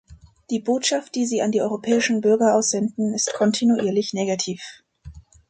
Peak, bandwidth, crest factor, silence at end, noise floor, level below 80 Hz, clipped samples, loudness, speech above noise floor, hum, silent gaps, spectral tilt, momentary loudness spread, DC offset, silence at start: -6 dBFS; 9.4 kHz; 16 dB; 0.3 s; -44 dBFS; -54 dBFS; under 0.1%; -21 LUFS; 23 dB; none; none; -4 dB/octave; 8 LU; under 0.1%; 0.1 s